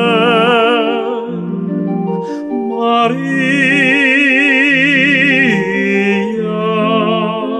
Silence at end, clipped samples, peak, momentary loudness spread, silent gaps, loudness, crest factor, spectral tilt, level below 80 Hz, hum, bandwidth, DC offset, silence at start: 0 s; under 0.1%; -2 dBFS; 10 LU; none; -12 LUFS; 12 dB; -5.5 dB/octave; -62 dBFS; none; 10.5 kHz; under 0.1%; 0 s